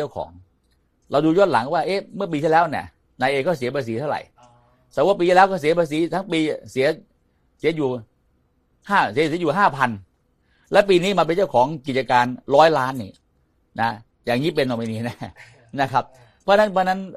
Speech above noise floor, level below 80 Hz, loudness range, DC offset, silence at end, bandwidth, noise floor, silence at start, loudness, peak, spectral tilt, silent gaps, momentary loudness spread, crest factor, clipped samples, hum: 44 dB; -58 dBFS; 5 LU; under 0.1%; 0 s; 15 kHz; -64 dBFS; 0 s; -20 LUFS; 0 dBFS; -6 dB/octave; none; 15 LU; 20 dB; under 0.1%; none